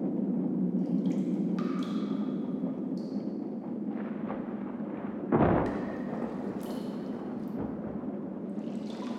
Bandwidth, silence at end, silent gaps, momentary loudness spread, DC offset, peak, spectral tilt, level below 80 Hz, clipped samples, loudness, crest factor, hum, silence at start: 12.5 kHz; 0 s; none; 8 LU; under 0.1%; -12 dBFS; -9 dB/octave; -56 dBFS; under 0.1%; -33 LUFS; 20 dB; none; 0 s